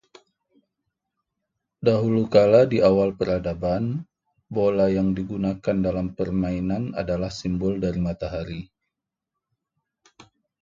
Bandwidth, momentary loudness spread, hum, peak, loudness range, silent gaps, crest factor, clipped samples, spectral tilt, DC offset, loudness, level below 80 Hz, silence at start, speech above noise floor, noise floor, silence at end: 7.6 kHz; 12 LU; none; -4 dBFS; 8 LU; none; 20 dB; under 0.1%; -8 dB/octave; under 0.1%; -23 LUFS; -46 dBFS; 1.8 s; 62 dB; -84 dBFS; 2 s